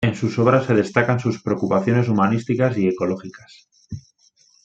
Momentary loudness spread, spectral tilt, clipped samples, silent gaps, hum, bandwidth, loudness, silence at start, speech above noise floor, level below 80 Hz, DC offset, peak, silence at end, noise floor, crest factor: 20 LU; -7.5 dB/octave; under 0.1%; none; none; 8 kHz; -20 LUFS; 0 s; 39 dB; -56 dBFS; under 0.1%; -2 dBFS; 0.65 s; -58 dBFS; 18 dB